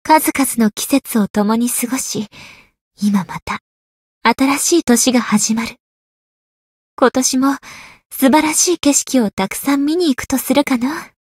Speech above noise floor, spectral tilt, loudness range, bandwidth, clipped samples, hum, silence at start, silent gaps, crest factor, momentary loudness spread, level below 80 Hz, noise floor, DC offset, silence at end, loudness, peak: over 75 dB; -3 dB/octave; 4 LU; 16.5 kHz; under 0.1%; none; 0.05 s; 1.30-1.34 s, 2.81-2.91 s, 3.42-3.46 s, 3.61-4.21 s, 5.80-6.97 s, 8.05-8.10 s, 9.33-9.37 s; 16 dB; 12 LU; -52 dBFS; under -90 dBFS; under 0.1%; 0.15 s; -15 LUFS; 0 dBFS